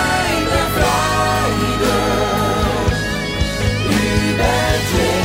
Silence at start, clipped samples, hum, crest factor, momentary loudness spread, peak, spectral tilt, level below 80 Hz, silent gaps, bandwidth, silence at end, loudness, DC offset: 0 s; under 0.1%; none; 14 dB; 3 LU; -2 dBFS; -4.5 dB/octave; -26 dBFS; none; 16.5 kHz; 0 s; -16 LUFS; under 0.1%